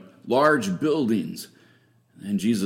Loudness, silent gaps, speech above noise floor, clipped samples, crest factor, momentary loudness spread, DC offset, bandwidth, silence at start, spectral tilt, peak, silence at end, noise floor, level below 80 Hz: -23 LUFS; none; 37 dB; under 0.1%; 20 dB; 19 LU; under 0.1%; 16.5 kHz; 0.25 s; -5.5 dB/octave; -6 dBFS; 0 s; -59 dBFS; -66 dBFS